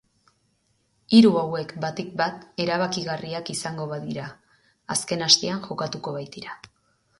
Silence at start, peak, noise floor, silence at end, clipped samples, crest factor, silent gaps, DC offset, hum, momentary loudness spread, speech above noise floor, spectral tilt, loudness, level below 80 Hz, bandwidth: 1.1 s; -2 dBFS; -69 dBFS; 0.65 s; under 0.1%; 24 dB; none; under 0.1%; none; 17 LU; 45 dB; -4 dB/octave; -23 LUFS; -64 dBFS; 11.5 kHz